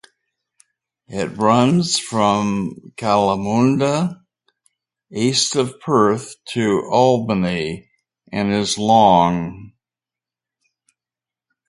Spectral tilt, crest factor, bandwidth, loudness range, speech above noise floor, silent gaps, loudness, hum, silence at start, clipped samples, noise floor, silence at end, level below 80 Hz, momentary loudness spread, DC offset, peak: -5 dB/octave; 18 dB; 11.5 kHz; 2 LU; 72 dB; none; -18 LUFS; none; 1.1 s; under 0.1%; -89 dBFS; 2 s; -52 dBFS; 12 LU; under 0.1%; 0 dBFS